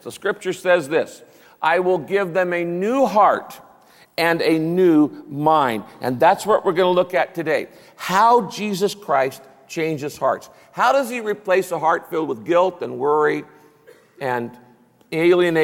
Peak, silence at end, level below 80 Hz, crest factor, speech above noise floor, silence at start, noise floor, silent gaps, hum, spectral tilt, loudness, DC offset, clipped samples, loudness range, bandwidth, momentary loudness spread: -4 dBFS; 0 s; -66 dBFS; 16 dB; 31 dB; 0.05 s; -50 dBFS; none; none; -5.5 dB/octave; -19 LUFS; under 0.1%; under 0.1%; 3 LU; 16.5 kHz; 11 LU